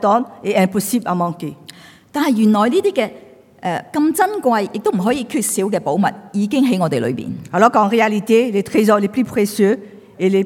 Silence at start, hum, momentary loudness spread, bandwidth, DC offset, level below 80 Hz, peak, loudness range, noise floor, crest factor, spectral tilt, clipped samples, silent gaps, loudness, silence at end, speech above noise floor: 0 s; none; 9 LU; 17.5 kHz; under 0.1%; -62 dBFS; 0 dBFS; 3 LU; -41 dBFS; 16 dB; -5.5 dB/octave; under 0.1%; none; -17 LUFS; 0 s; 25 dB